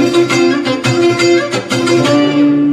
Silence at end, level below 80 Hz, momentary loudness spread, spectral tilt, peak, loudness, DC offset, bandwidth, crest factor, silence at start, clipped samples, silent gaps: 0 s; -54 dBFS; 4 LU; -5 dB/octave; 0 dBFS; -11 LUFS; under 0.1%; 13 kHz; 10 dB; 0 s; under 0.1%; none